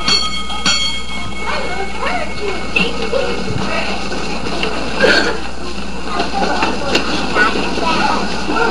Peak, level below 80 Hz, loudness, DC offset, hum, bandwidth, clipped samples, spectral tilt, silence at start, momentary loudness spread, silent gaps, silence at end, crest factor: 0 dBFS; -34 dBFS; -17 LUFS; 10%; none; 13.5 kHz; under 0.1%; -3 dB/octave; 0 s; 8 LU; none; 0 s; 18 dB